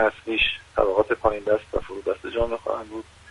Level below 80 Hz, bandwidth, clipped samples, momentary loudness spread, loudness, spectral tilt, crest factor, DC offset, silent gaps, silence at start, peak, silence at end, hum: -42 dBFS; 11 kHz; under 0.1%; 9 LU; -24 LUFS; -5 dB/octave; 20 dB; under 0.1%; none; 0 s; -4 dBFS; 0 s; none